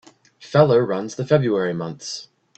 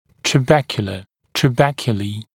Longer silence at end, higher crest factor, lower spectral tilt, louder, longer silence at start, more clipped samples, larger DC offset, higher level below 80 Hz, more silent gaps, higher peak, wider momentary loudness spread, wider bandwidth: first, 0.35 s vs 0.1 s; about the same, 20 dB vs 18 dB; about the same, -6.5 dB/octave vs -5.5 dB/octave; about the same, -20 LUFS vs -18 LUFS; first, 0.4 s vs 0.25 s; neither; neither; second, -60 dBFS vs -48 dBFS; neither; about the same, -2 dBFS vs 0 dBFS; first, 15 LU vs 11 LU; second, 8.6 kHz vs 17 kHz